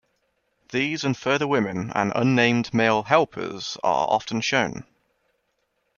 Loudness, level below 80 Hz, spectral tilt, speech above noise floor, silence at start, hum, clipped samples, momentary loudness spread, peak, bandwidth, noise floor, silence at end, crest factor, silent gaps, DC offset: -23 LUFS; -62 dBFS; -5 dB/octave; 50 dB; 0.7 s; none; under 0.1%; 9 LU; -2 dBFS; 7.2 kHz; -73 dBFS; 1.15 s; 22 dB; none; under 0.1%